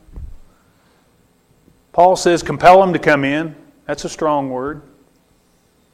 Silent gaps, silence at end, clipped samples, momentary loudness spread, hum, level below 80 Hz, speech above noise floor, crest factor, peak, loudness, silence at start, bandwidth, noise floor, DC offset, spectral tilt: none; 1.15 s; under 0.1%; 18 LU; none; -42 dBFS; 43 dB; 18 dB; 0 dBFS; -15 LUFS; 0.15 s; 13.5 kHz; -57 dBFS; under 0.1%; -5 dB/octave